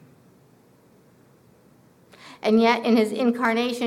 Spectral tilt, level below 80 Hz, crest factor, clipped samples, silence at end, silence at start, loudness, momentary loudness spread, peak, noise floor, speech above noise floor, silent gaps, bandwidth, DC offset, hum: -5 dB/octave; -70 dBFS; 20 dB; under 0.1%; 0 s; 2.25 s; -21 LUFS; 4 LU; -6 dBFS; -56 dBFS; 36 dB; none; 14 kHz; under 0.1%; none